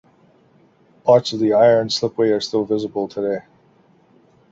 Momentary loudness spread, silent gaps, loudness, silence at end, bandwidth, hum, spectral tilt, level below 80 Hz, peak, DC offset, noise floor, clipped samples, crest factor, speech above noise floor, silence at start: 10 LU; none; -18 LUFS; 1.1 s; 8 kHz; none; -5.5 dB/octave; -62 dBFS; -2 dBFS; under 0.1%; -55 dBFS; under 0.1%; 18 dB; 38 dB; 1.05 s